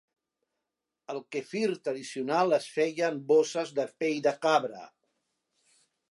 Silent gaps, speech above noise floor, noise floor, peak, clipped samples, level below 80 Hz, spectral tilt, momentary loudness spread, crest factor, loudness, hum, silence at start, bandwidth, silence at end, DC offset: none; 58 dB; -87 dBFS; -12 dBFS; under 0.1%; -86 dBFS; -4.5 dB/octave; 11 LU; 20 dB; -29 LUFS; none; 1.1 s; 11.5 kHz; 1.25 s; under 0.1%